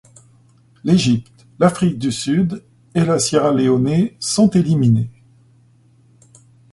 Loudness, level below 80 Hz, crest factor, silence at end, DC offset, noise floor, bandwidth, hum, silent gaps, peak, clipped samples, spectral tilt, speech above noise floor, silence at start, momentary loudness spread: -17 LUFS; -50 dBFS; 18 dB; 1.6 s; under 0.1%; -52 dBFS; 11.5 kHz; none; none; 0 dBFS; under 0.1%; -6 dB/octave; 37 dB; 0.85 s; 8 LU